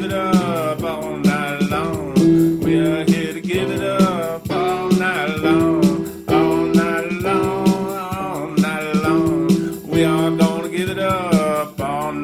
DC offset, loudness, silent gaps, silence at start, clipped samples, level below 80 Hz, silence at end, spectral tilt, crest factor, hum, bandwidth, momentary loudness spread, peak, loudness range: under 0.1%; -18 LUFS; none; 0 s; under 0.1%; -46 dBFS; 0 s; -6.5 dB/octave; 16 dB; none; 15.5 kHz; 7 LU; -2 dBFS; 1 LU